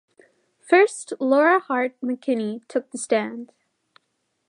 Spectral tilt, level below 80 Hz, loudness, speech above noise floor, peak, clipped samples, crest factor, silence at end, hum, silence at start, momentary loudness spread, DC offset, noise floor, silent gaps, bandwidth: -4 dB/octave; -84 dBFS; -22 LUFS; 52 dB; -4 dBFS; under 0.1%; 18 dB; 1.05 s; none; 0.7 s; 11 LU; under 0.1%; -74 dBFS; none; 11 kHz